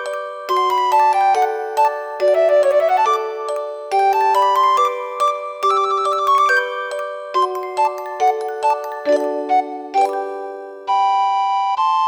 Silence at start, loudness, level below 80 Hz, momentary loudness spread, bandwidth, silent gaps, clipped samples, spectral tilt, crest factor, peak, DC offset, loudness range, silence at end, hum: 0 s; -17 LUFS; -72 dBFS; 10 LU; over 20 kHz; none; under 0.1%; -1 dB/octave; 12 dB; -6 dBFS; under 0.1%; 4 LU; 0 s; none